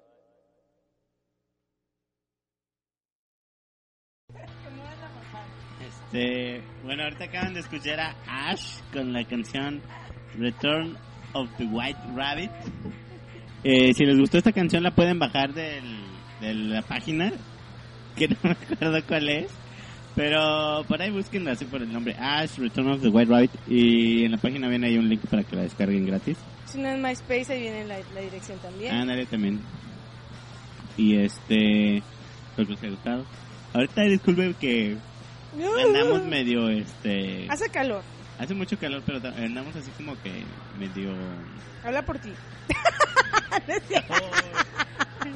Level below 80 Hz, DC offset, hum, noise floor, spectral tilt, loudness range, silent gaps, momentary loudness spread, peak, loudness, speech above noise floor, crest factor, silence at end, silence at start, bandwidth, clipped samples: -52 dBFS; under 0.1%; 60 Hz at -45 dBFS; under -90 dBFS; -5.5 dB/octave; 11 LU; none; 22 LU; -8 dBFS; -25 LUFS; over 65 dB; 20 dB; 0 s; 4.3 s; 11 kHz; under 0.1%